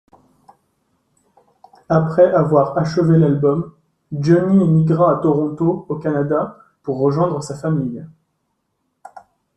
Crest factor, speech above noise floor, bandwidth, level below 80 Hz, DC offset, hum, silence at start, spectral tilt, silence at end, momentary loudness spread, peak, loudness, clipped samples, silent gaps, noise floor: 16 dB; 55 dB; 8.6 kHz; -56 dBFS; under 0.1%; none; 1.9 s; -9 dB/octave; 0.35 s; 13 LU; -2 dBFS; -17 LUFS; under 0.1%; none; -71 dBFS